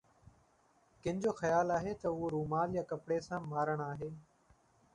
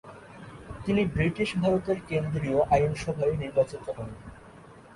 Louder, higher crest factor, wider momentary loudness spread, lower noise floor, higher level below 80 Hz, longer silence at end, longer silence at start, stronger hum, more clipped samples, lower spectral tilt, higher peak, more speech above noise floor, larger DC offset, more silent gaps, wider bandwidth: second, -36 LUFS vs -27 LUFS; about the same, 18 dB vs 18 dB; second, 10 LU vs 21 LU; first, -71 dBFS vs -50 dBFS; second, -66 dBFS vs -48 dBFS; first, 0.7 s vs 0 s; first, 1.05 s vs 0.05 s; neither; neither; about the same, -7 dB/octave vs -7 dB/octave; second, -20 dBFS vs -10 dBFS; first, 35 dB vs 23 dB; neither; neither; about the same, 11 kHz vs 11.5 kHz